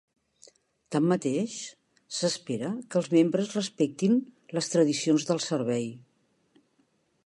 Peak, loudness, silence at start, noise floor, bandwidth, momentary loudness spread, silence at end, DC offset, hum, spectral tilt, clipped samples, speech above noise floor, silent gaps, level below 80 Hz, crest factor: -10 dBFS; -28 LUFS; 0.9 s; -70 dBFS; 11.5 kHz; 10 LU; 1.25 s; under 0.1%; none; -5 dB/octave; under 0.1%; 43 dB; none; -76 dBFS; 18 dB